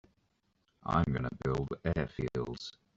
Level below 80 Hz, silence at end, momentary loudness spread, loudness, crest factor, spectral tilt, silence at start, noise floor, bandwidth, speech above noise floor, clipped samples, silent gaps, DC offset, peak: -50 dBFS; 0.25 s; 10 LU; -35 LUFS; 22 dB; -7.5 dB/octave; 0.85 s; -76 dBFS; 7.8 kHz; 43 dB; under 0.1%; none; under 0.1%; -14 dBFS